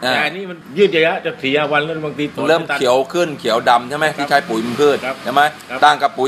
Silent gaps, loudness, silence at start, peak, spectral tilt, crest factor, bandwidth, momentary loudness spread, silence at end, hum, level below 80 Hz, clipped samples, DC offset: none; -16 LUFS; 0 s; 0 dBFS; -4 dB/octave; 16 dB; 15 kHz; 7 LU; 0 s; none; -60 dBFS; under 0.1%; under 0.1%